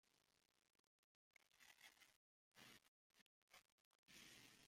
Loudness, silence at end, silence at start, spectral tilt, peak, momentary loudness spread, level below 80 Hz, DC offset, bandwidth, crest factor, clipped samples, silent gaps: -67 LUFS; 0 s; 0.05 s; -1 dB/octave; -50 dBFS; 5 LU; under -90 dBFS; under 0.1%; 16.5 kHz; 24 dB; under 0.1%; 0.79-1.31 s, 2.16-2.52 s, 2.88-3.10 s, 3.21-3.48 s, 3.72-4.03 s